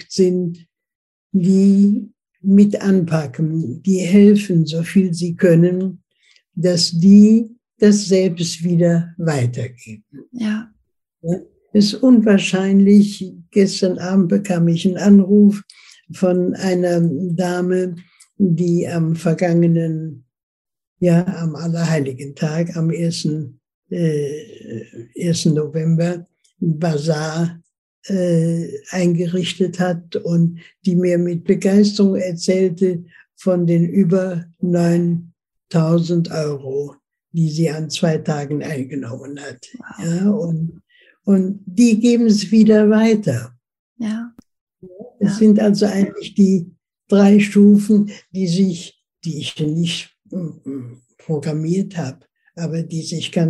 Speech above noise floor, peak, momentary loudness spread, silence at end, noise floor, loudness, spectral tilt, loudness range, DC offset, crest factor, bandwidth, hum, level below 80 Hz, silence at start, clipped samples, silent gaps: 42 dB; 0 dBFS; 16 LU; 0 s; -58 dBFS; -17 LUFS; -7 dB/octave; 7 LU; under 0.1%; 16 dB; 12 kHz; none; -62 dBFS; 0.1 s; under 0.1%; 0.95-1.30 s, 20.43-20.65 s, 20.87-20.96 s, 23.74-23.83 s, 27.78-28.02 s, 43.79-43.96 s, 44.61-44.67 s